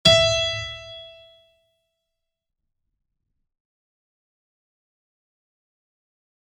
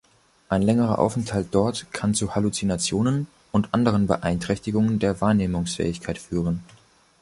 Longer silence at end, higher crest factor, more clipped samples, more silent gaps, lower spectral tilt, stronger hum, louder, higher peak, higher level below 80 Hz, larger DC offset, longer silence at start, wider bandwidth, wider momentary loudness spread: first, 5.5 s vs 0.6 s; first, 26 dB vs 20 dB; neither; neither; second, -2.5 dB/octave vs -6 dB/octave; neither; first, -20 LUFS vs -24 LUFS; about the same, -4 dBFS vs -4 dBFS; second, -50 dBFS vs -44 dBFS; neither; second, 0.05 s vs 0.5 s; first, 13.5 kHz vs 11.5 kHz; first, 24 LU vs 6 LU